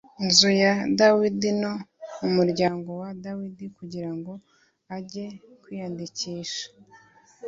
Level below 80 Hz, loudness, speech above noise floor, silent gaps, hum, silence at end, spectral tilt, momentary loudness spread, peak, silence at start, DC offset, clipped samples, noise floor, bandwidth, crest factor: -64 dBFS; -23 LUFS; 30 dB; none; none; 0 s; -4 dB/octave; 21 LU; -2 dBFS; 0.2 s; under 0.1%; under 0.1%; -55 dBFS; 7.8 kHz; 24 dB